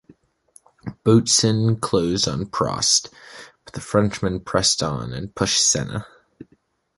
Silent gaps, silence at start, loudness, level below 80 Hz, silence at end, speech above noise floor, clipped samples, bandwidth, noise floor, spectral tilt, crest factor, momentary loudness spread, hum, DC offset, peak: none; 0.85 s; -20 LUFS; -46 dBFS; 0.55 s; 42 dB; under 0.1%; 11.5 kHz; -62 dBFS; -3.5 dB/octave; 20 dB; 21 LU; none; under 0.1%; -2 dBFS